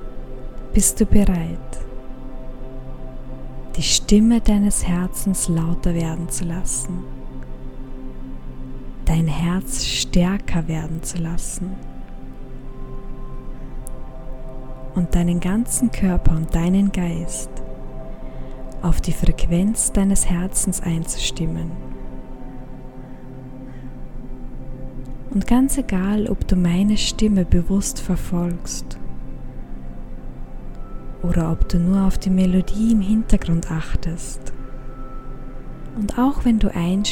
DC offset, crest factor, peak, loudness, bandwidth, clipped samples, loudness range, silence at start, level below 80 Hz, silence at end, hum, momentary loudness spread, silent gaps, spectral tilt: under 0.1%; 20 dB; 0 dBFS; -20 LUFS; 17 kHz; under 0.1%; 10 LU; 0 s; -26 dBFS; 0 s; none; 20 LU; none; -5 dB/octave